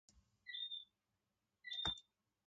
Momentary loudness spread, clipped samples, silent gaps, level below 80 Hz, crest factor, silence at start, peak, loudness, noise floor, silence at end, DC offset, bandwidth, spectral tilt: 17 LU; under 0.1%; none; -70 dBFS; 24 dB; 0.15 s; -28 dBFS; -46 LUFS; -89 dBFS; 0.45 s; under 0.1%; 8.8 kHz; -2 dB/octave